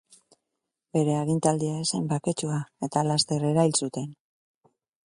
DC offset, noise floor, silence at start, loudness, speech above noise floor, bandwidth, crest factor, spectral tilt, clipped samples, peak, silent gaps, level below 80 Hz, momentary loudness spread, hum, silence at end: under 0.1%; -84 dBFS; 0.95 s; -26 LUFS; 58 dB; 11.5 kHz; 20 dB; -5 dB/octave; under 0.1%; -8 dBFS; none; -66 dBFS; 8 LU; none; 0.95 s